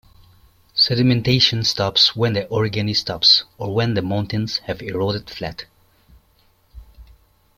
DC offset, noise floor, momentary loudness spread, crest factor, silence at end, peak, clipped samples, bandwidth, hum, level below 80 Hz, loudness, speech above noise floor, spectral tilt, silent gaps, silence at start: under 0.1%; -58 dBFS; 13 LU; 18 dB; 0.55 s; -2 dBFS; under 0.1%; 16 kHz; none; -48 dBFS; -18 LUFS; 39 dB; -5 dB/octave; none; 0.75 s